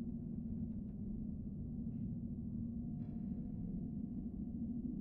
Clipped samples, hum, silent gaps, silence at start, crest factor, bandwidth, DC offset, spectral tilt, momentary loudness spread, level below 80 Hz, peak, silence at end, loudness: under 0.1%; none; none; 0 s; 12 dB; 1.4 kHz; under 0.1%; -14.5 dB/octave; 2 LU; -54 dBFS; -32 dBFS; 0 s; -45 LUFS